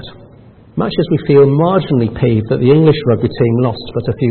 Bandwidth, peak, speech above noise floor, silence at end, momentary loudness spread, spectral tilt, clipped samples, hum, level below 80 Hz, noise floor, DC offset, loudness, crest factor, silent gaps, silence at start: 4.4 kHz; 0 dBFS; 29 dB; 0 s; 9 LU; -13.5 dB/octave; under 0.1%; none; -40 dBFS; -41 dBFS; under 0.1%; -13 LUFS; 12 dB; none; 0 s